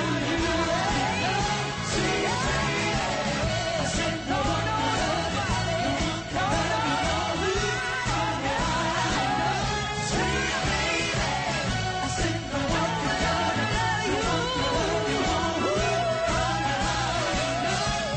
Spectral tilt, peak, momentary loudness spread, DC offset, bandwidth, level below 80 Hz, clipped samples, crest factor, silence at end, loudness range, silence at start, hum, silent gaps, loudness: -4 dB/octave; -14 dBFS; 2 LU; under 0.1%; 8.8 kHz; -40 dBFS; under 0.1%; 12 dB; 0 s; 1 LU; 0 s; none; none; -26 LUFS